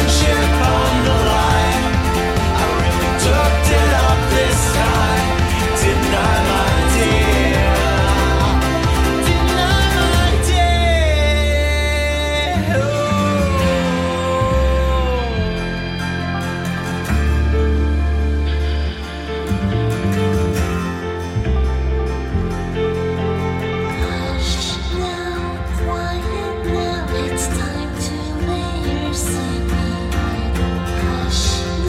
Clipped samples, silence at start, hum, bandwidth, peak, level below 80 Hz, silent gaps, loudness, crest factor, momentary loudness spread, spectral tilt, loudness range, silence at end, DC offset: under 0.1%; 0 s; none; 16 kHz; -2 dBFS; -20 dBFS; none; -17 LUFS; 16 dB; 8 LU; -5 dB/octave; 6 LU; 0 s; under 0.1%